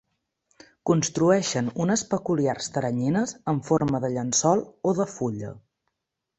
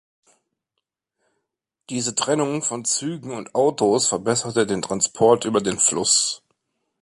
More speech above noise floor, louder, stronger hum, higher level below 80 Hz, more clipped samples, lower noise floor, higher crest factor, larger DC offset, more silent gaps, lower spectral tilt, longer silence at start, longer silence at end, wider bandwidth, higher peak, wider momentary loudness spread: about the same, 58 dB vs 60 dB; second, -25 LUFS vs -20 LUFS; neither; about the same, -60 dBFS vs -62 dBFS; neither; about the same, -83 dBFS vs -81 dBFS; about the same, 18 dB vs 20 dB; neither; neither; first, -5 dB/octave vs -3 dB/octave; second, 0.85 s vs 1.9 s; first, 0.8 s vs 0.65 s; second, 8.4 kHz vs 11.5 kHz; second, -6 dBFS vs -2 dBFS; about the same, 8 LU vs 9 LU